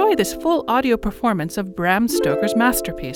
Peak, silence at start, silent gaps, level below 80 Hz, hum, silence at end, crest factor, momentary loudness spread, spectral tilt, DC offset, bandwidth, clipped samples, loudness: -4 dBFS; 0 s; none; -40 dBFS; none; 0 s; 16 dB; 5 LU; -4.5 dB/octave; under 0.1%; 19.5 kHz; under 0.1%; -19 LUFS